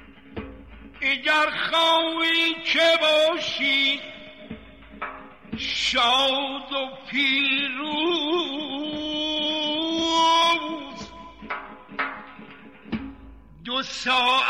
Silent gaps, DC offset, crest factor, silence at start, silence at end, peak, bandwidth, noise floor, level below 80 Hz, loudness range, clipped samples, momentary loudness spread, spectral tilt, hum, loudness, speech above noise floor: none; 0.2%; 14 dB; 0 s; 0 s; -10 dBFS; 14.5 kHz; -46 dBFS; -54 dBFS; 6 LU; under 0.1%; 21 LU; -2.5 dB/octave; none; -22 LUFS; 23 dB